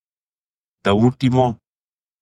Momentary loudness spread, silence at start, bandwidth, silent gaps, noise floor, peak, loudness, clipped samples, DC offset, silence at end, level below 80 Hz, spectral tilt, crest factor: 8 LU; 0.85 s; 10 kHz; none; under -90 dBFS; -2 dBFS; -18 LUFS; under 0.1%; under 0.1%; 0.7 s; -50 dBFS; -7.5 dB/octave; 18 dB